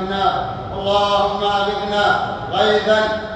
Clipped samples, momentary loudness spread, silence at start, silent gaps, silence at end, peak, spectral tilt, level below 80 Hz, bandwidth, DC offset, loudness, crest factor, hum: under 0.1%; 7 LU; 0 s; none; 0 s; -2 dBFS; -4.5 dB/octave; -42 dBFS; 9.2 kHz; under 0.1%; -18 LUFS; 16 dB; none